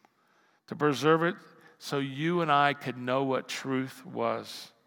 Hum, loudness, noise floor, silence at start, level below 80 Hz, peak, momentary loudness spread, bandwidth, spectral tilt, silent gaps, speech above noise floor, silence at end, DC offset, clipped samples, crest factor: none; -29 LUFS; -67 dBFS; 0.7 s; -86 dBFS; -8 dBFS; 14 LU; 18 kHz; -5.5 dB/octave; none; 38 dB; 0.2 s; under 0.1%; under 0.1%; 22 dB